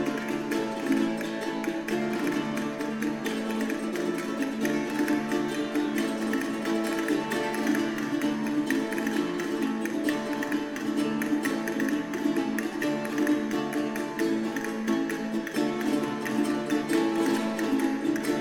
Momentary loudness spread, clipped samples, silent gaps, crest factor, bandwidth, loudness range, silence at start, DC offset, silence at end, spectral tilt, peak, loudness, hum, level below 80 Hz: 4 LU; under 0.1%; none; 16 dB; 19 kHz; 2 LU; 0 s; under 0.1%; 0 s; -4.5 dB/octave; -12 dBFS; -28 LUFS; none; -64 dBFS